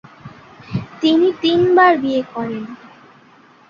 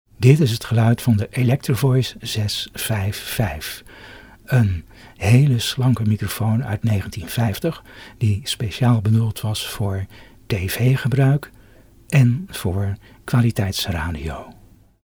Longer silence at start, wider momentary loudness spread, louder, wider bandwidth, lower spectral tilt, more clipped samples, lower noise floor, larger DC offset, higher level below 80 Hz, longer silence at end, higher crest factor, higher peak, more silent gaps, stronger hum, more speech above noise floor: about the same, 0.25 s vs 0.2 s; first, 16 LU vs 11 LU; first, -16 LUFS vs -20 LUFS; second, 7.2 kHz vs over 20 kHz; about the same, -6.5 dB/octave vs -6 dB/octave; neither; about the same, -48 dBFS vs -48 dBFS; neither; second, -54 dBFS vs -42 dBFS; first, 0.95 s vs 0.55 s; about the same, 16 dB vs 20 dB; about the same, -2 dBFS vs 0 dBFS; neither; neither; first, 33 dB vs 29 dB